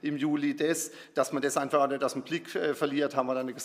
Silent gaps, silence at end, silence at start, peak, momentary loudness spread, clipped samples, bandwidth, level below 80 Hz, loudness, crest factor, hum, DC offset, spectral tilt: none; 0 s; 0.05 s; -12 dBFS; 5 LU; under 0.1%; 16 kHz; -86 dBFS; -30 LUFS; 18 dB; none; under 0.1%; -4 dB/octave